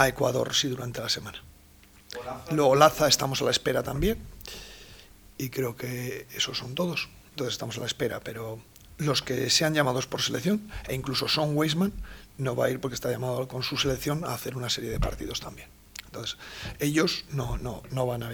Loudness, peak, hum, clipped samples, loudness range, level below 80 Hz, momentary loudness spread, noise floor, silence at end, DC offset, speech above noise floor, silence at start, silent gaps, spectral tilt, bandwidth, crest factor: -28 LUFS; -4 dBFS; none; under 0.1%; 7 LU; -46 dBFS; 18 LU; -54 dBFS; 0 s; under 0.1%; 26 dB; 0 s; none; -4 dB/octave; over 20 kHz; 26 dB